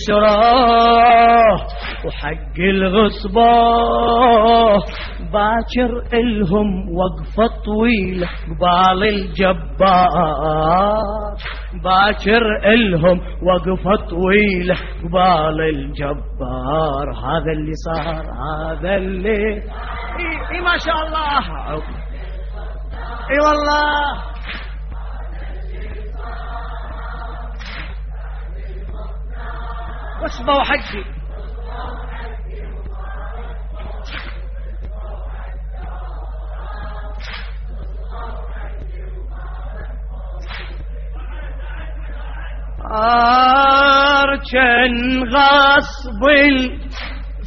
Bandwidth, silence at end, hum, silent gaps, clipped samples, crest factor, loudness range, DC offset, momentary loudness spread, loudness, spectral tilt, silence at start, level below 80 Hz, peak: 6.2 kHz; 0 s; none; none; under 0.1%; 16 dB; 17 LU; under 0.1%; 20 LU; -15 LUFS; -3 dB/octave; 0 s; -28 dBFS; -2 dBFS